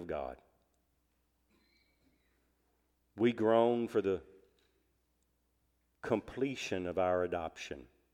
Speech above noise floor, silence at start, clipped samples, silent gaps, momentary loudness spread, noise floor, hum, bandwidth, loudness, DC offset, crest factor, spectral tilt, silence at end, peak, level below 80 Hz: 44 dB; 0 s; under 0.1%; none; 17 LU; -77 dBFS; none; 12.5 kHz; -34 LUFS; under 0.1%; 22 dB; -6 dB/octave; 0.3 s; -14 dBFS; -66 dBFS